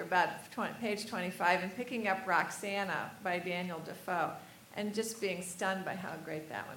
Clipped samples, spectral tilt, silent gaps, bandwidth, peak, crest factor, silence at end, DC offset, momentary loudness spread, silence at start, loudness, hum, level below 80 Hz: under 0.1%; -4 dB/octave; none; 17.5 kHz; -14 dBFS; 22 dB; 0 s; under 0.1%; 10 LU; 0 s; -36 LUFS; none; -80 dBFS